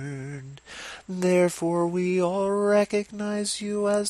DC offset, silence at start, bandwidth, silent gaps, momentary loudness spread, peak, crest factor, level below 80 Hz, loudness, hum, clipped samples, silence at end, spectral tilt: under 0.1%; 0 s; 13.5 kHz; none; 16 LU; -10 dBFS; 16 dB; -62 dBFS; -25 LUFS; none; under 0.1%; 0 s; -5 dB/octave